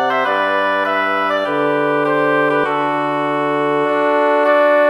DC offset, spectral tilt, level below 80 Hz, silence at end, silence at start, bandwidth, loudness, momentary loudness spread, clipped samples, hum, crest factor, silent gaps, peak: under 0.1%; -6 dB/octave; -68 dBFS; 0 s; 0 s; 12 kHz; -16 LUFS; 4 LU; under 0.1%; none; 14 dB; none; -2 dBFS